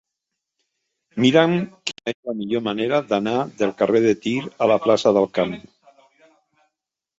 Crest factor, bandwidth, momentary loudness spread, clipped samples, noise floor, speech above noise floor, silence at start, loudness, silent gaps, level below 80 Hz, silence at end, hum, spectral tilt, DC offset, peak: 20 dB; 8 kHz; 11 LU; under 0.1%; -82 dBFS; 62 dB; 1.15 s; -20 LUFS; 2.14-2.23 s; -62 dBFS; 1.6 s; none; -5.5 dB/octave; under 0.1%; -2 dBFS